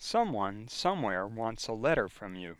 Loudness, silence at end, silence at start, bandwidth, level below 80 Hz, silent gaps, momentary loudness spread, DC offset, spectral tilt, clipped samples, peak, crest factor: -32 LUFS; 0.05 s; 0 s; 14 kHz; -56 dBFS; none; 6 LU; under 0.1%; -4.5 dB/octave; under 0.1%; -14 dBFS; 18 dB